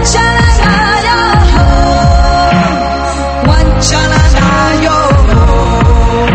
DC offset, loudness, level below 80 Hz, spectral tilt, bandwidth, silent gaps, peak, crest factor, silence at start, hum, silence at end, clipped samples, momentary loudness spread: under 0.1%; -8 LUFS; -12 dBFS; -5 dB/octave; 8.8 kHz; none; 0 dBFS; 8 dB; 0 s; none; 0 s; 0.8%; 3 LU